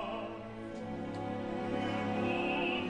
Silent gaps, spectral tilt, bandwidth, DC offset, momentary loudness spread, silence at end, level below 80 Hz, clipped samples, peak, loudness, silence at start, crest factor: none; -6.5 dB/octave; 10.5 kHz; under 0.1%; 10 LU; 0 s; -60 dBFS; under 0.1%; -22 dBFS; -36 LUFS; 0 s; 14 dB